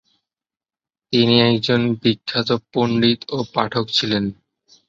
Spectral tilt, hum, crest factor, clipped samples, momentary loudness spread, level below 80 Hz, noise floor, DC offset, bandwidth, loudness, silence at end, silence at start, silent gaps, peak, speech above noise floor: -6 dB/octave; none; 18 dB; under 0.1%; 8 LU; -54 dBFS; under -90 dBFS; under 0.1%; 7.6 kHz; -18 LUFS; 0.55 s; 1.1 s; none; -2 dBFS; over 72 dB